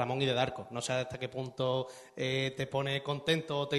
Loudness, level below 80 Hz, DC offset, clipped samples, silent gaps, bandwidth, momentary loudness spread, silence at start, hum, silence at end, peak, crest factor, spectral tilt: -34 LUFS; -66 dBFS; under 0.1%; under 0.1%; none; 12 kHz; 8 LU; 0 s; none; 0 s; -14 dBFS; 20 dB; -5 dB/octave